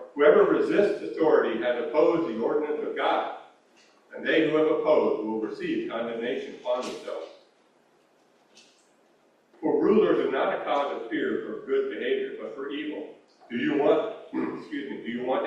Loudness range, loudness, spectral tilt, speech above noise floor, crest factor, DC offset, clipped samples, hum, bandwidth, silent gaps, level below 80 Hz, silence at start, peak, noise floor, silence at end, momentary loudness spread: 8 LU; -26 LUFS; -6 dB/octave; 38 dB; 20 dB; under 0.1%; under 0.1%; none; 9 kHz; none; -72 dBFS; 0 s; -6 dBFS; -63 dBFS; 0 s; 13 LU